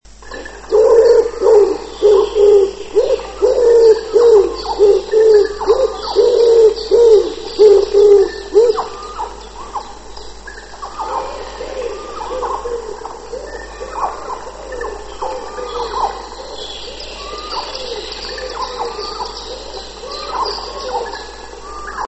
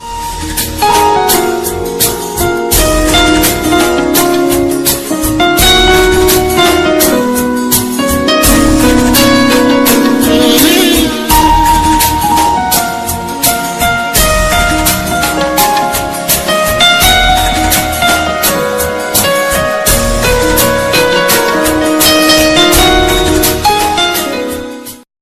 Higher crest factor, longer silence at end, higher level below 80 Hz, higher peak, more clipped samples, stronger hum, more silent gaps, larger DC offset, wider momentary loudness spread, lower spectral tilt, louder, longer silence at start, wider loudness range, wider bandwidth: about the same, 14 dB vs 10 dB; second, 0 s vs 0.2 s; second, -38 dBFS vs -22 dBFS; about the same, 0 dBFS vs 0 dBFS; second, under 0.1% vs 0.7%; neither; neither; first, 0.4% vs under 0.1%; first, 19 LU vs 7 LU; about the same, -4 dB/octave vs -3 dB/octave; second, -14 LUFS vs -8 LUFS; first, 0.2 s vs 0 s; first, 14 LU vs 3 LU; second, 8.4 kHz vs over 20 kHz